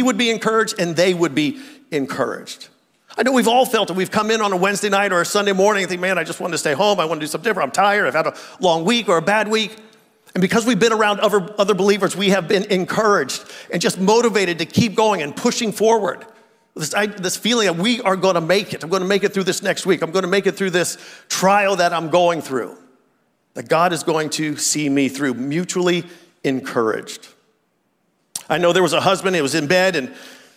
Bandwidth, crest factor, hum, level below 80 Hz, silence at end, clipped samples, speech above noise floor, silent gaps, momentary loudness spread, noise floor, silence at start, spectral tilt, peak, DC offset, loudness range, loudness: 16 kHz; 16 dB; none; -68 dBFS; 0.2 s; under 0.1%; 48 dB; none; 9 LU; -66 dBFS; 0 s; -4 dB/octave; -4 dBFS; under 0.1%; 3 LU; -18 LUFS